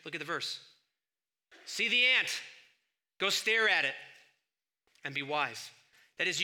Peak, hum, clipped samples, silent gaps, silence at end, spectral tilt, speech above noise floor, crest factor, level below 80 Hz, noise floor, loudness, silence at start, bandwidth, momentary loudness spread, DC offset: -14 dBFS; none; under 0.1%; none; 0 s; -1 dB/octave; over 58 dB; 22 dB; -86 dBFS; under -90 dBFS; -30 LUFS; 0.05 s; 19 kHz; 20 LU; under 0.1%